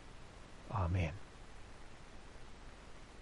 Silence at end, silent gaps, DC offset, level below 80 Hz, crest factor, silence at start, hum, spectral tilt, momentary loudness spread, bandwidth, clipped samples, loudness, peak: 0 s; none; under 0.1%; -54 dBFS; 18 dB; 0 s; none; -6.5 dB/octave; 19 LU; 11 kHz; under 0.1%; -40 LUFS; -26 dBFS